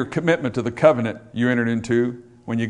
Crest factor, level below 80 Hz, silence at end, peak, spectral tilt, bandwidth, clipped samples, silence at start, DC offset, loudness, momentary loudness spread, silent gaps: 20 dB; -56 dBFS; 0 s; 0 dBFS; -7 dB/octave; 10 kHz; under 0.1%; 0 s; under 0.1%; -21 LUFS; 10 LU; none